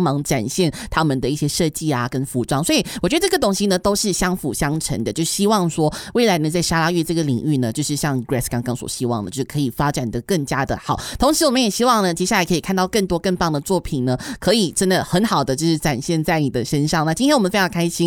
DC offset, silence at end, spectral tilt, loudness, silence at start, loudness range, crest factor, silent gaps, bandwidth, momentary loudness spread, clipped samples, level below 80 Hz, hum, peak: under 0.1%; 0 s; -4.5 dB/octave; -19 LUFS; 0 s; 3 LU; 16 dB; none; 18 kHz; 6 LU; under 0.1%; -40 dBFS; none; -4 dBFS